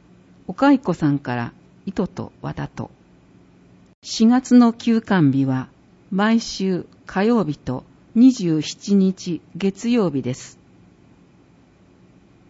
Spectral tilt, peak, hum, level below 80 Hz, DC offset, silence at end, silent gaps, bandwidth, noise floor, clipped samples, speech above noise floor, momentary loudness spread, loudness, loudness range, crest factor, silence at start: -6.5 dB/octave; -4 dBFS; none; -56 dBFS; under 0.1%; 2 s; 3.94-4.02 s; 8 kHz; -52 dBFS; under 0.1%; 34 dB; 17 LU; -20 LUFS; 7 LU; 16 dB; 0.5 s